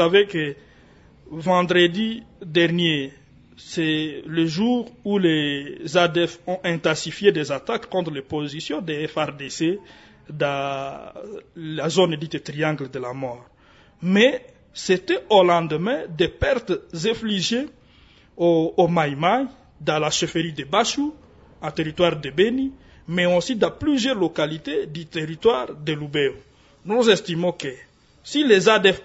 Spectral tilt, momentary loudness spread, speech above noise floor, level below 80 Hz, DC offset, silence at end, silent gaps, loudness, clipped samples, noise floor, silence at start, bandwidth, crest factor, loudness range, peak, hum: -5 dB/octave; 13 LU; 32 dB; -52 dBFS; under 0.1%; 0 s; none; -22 LUFS; under 0.1%; -53 dBFS; 0 s; 8 kHz; 20 dB; 5 LU; -2 dBFS; none